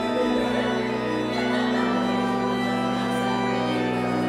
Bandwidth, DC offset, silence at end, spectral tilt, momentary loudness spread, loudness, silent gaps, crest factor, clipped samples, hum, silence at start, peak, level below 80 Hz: 13.5 kHz; under 0.1%; 0 s; -5.5 dB/octave; 2 LU; -24 LUFS; none; 12 dB; under 0.1%; none; 0 s; -12 dBFS; -52 dBFS